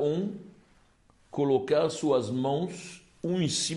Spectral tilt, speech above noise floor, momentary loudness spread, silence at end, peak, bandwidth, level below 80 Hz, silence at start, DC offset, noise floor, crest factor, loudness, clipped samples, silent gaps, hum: -5 dB/octave; 35 dB; 15 LU; 0 s; -14 dBFS; 11.5 kHz; -68 dBFS; 0 s; under 0.1%; -63 dBFS; 16 dB; -29 LUFS; under 0.1%; none; none